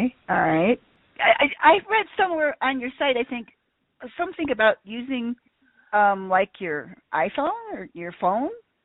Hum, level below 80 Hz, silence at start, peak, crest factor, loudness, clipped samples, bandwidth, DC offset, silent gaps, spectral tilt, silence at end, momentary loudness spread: none; -60 dBFS; 0 s; -2 dBFS; 22 dB; -23 LUFS; under 0.1%; 4.1 kHz; under 0.1%; none; -2 dB/octave; 0.25 s; 14 LU